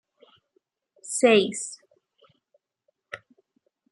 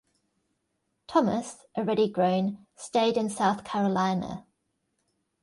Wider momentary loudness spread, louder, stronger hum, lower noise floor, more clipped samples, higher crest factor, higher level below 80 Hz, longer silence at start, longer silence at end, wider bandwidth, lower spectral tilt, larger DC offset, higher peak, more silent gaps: first, 25 LU vs 10 LU; first, -23 LUFS vs -27 LUFS; neither; about the same, -75 dBFS vs -78 dBFS; neither; about the same, 22 dB vs 18 dB; second, -78 dBFS vs -66 dBFS; about the same, 1.05 s vs 1.1 s; second, 0.75 s vs 1 s; about the same, 11.5 kHz vs 11.5 kHz; second, -3 dB/octave vs -6 dB/octave; neither; first, -6 dBFS vs -10 dBFS; neither